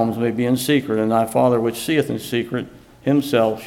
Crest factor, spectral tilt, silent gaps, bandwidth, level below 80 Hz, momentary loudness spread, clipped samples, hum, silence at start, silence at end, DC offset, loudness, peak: 16 dB; -5.5 dB/octave; none; 17 kHz; -56 dBFS; 9 LU; under 0.1%; none; 0 s; 0 s; under 0.1%; -20 LUFS; -4 dBFS